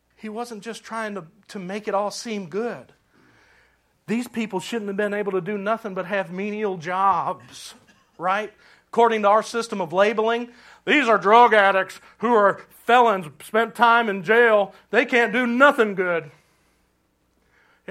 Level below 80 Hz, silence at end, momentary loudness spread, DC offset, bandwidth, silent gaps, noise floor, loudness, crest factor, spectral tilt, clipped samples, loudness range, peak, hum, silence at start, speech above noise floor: -72 dBFS; 1.6 s; 16 LU; under 0.1%; 15 kHz; none; -67 dBFS; -21 LUFS; 22 dB; -4.5 dB/octave; under 0.1%; 12 LU; 0 dBFS; none; 0.25 s; 46 dB